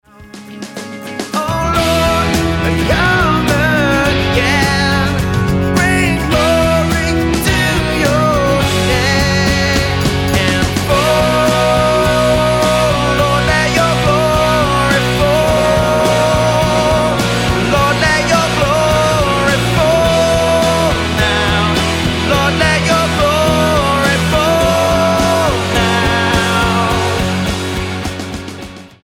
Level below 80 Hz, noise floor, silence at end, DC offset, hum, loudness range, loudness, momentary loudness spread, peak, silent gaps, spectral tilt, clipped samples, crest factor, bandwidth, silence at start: -26 dBFS; -34 dBFS; 0.15 s; under 0.1%; none; 1 LU; -12 LUFS; 4 LU; 0 dBFS; none; -4.5 dB/octave; under 0.1%; 12 dB; 17.5 kHz; 0.2 s